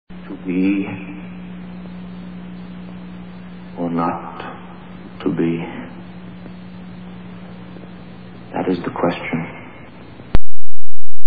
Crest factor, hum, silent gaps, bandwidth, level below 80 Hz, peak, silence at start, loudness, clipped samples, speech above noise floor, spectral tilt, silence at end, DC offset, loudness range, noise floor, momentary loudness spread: 10 dB; none; none; 4.9 kHz; -34 dBFS; 0 dBFS; 0.45 s; -26 LUFS; 8%; 18 dB; -10 dB/octave; 0 s; under 0.1%; 4 LU; -39 dBFS; 16 LU